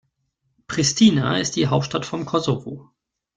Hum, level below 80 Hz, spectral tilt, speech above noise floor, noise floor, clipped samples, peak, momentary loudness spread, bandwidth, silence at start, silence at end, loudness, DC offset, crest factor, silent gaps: none; -54 dBFS; -4.5 dB/octave; 52 dB; -72 dBFS; under 0.1%; -2 dBFS; 13 LU; 9.4 kHz; 0.7 s; 0.55 s; -20 LUFS; under 0.1%; 20 dB; none